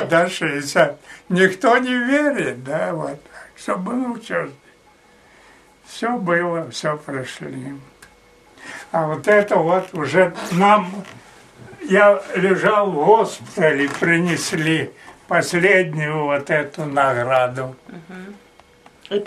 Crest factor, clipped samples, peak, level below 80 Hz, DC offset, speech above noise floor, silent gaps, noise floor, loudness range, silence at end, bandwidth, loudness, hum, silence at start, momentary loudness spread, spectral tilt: 20 dB; under 0.1%; 0 dBFS; -62 dBFS; under 0.1%; 33 dB; none; -52 dBFS; 8 LU; 0 s; 14 kHz; -18 LUFS; none; 0 s; 18 LU; -5 dB/octave